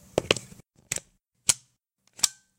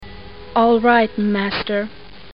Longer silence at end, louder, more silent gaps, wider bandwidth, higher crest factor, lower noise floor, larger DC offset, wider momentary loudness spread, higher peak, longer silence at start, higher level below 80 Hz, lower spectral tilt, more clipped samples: second, 0.3 s vs 0.45 s; second, -27 LUFS vs -17 LUFS; neither; first, 17 kHz vs 5.6 kHz; first, 30 dB vs 18 dB; first, -70 dBFS vs -37 dBFS; second, under 0.1% vs 1%; second, 8 LU vs 18 LU; about the same, 0 dBFS vs 0 dBFS; first, 0.15 s vs 0 s; second, -58 dBFS vs -46 dBFS; second, -1 dB/octave vs -9.5 dB/octave; neither